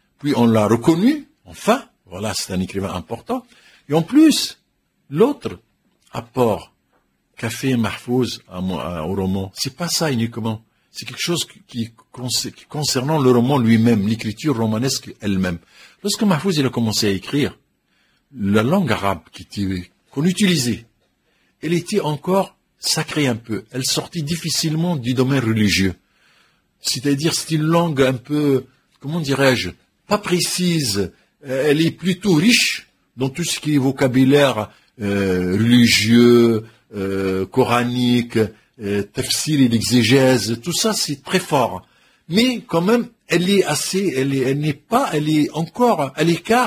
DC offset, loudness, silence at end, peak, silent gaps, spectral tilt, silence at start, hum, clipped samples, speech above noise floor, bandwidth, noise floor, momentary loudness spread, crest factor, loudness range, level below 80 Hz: under 0.1%; -19 LUFS; 0 s; 0 dBFS; none; -5 dB/octave; 0.25 s; none; under 0.1%; 48 dB; 16 kHz; -66 dBFS; 13 LU; 18 dB; 7 LU; -48 dBFS